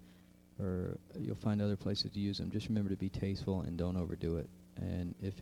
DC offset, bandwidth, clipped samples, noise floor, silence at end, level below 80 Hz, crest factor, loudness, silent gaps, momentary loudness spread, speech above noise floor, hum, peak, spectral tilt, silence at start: under 0.1%; 14.5 kHz; under 0.1%; -61 dBFS; 0 s; -56 dBFS; 16 dB; -38 LUFS; none; 8 LU; 24 dB; none; -22 dBFS; -7.5 dB/octave; 0 s